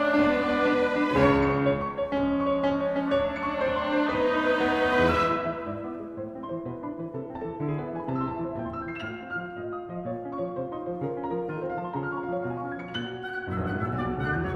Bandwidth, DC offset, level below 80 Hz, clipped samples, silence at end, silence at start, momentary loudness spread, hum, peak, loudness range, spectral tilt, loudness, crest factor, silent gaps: 9.4 kHz; under 0.1%; -48 dBFS; under 0.1%; 0 s; 0 s; 13 LU; none; -10 dBFS; 8 LU; -7.5 dB/octave; -28 LUFS; 18 dB; none